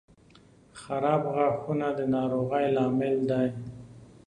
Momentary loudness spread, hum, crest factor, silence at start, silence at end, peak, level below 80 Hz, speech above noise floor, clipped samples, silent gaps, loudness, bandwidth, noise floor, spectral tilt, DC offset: 14 LU; none; 18 dB; 0.75 s; 0.2 s; -12 dBFS; -62 dBFS; 30 dB; under 0.1%; none; -27 LUFS; 10 kHz; -57 dBFS; -8 dB/octave; under 0.1%